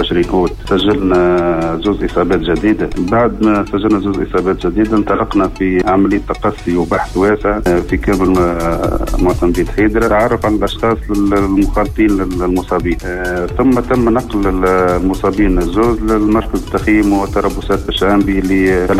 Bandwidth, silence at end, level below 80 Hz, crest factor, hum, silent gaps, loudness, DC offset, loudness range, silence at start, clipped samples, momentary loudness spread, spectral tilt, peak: 15 kHz; 0 s; -24 dBFS; 10 dB; none; none; -14 LUFS; under 0.1%; 1 LU; 0 s; under 0.1%; 4 LU; -6.5 dB/octave; -2 dBFS